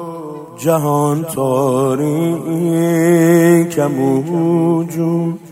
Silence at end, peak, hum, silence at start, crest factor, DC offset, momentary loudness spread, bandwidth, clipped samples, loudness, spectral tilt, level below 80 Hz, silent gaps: 0 s; -2 dBFS; none; 0 s; 14 dB; under 0.1%; 7 LU; 16 kHz; under 0.1%; -15 LUFS; -7 dB/octave; -58 dBFS; none